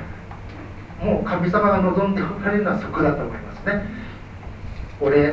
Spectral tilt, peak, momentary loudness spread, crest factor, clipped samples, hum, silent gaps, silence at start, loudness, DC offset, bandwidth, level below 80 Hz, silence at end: -9 dB/octave; -4 dBFS; 19 LU; 18 dB; under 0.1%; none; none; 0 s; -21 LUFS; under 0.1%; 7.6 kHz; -38 dBFS; 0 s